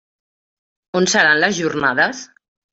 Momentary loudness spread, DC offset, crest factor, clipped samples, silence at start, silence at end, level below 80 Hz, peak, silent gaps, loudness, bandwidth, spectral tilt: 9 LU; under 0.1%; 18 dB; under 0.1%; 0.95 s; 0.5 s; -60 dBFS; -2 dBFS; none; -16 LUFS; 8.2 kHz; -3 dB/octave